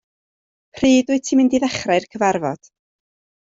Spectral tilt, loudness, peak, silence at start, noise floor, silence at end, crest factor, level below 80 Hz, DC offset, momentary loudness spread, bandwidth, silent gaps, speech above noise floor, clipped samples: -4.5 dB/octave; -18 LUFS; -4 dBFS; 0.75 s; under -90 dBFS; 0.9 s; 16 dB; -54 dBFS; under 0.1%; 8 LU; 7.8 kHz; none; over 73 dB; under 0.1%